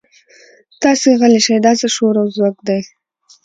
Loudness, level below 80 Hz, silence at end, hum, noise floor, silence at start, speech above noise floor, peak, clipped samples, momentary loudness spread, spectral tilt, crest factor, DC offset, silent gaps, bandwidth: -13 LUFS; -62 dBFS; 0.6 s; none; -47 dBFS; 0.8 s; 34 dB; 0 dBFS; under 0.1%; 9 LU; -4 dB/octave; 14 dB; under 0.1%; none; 9.4 kHz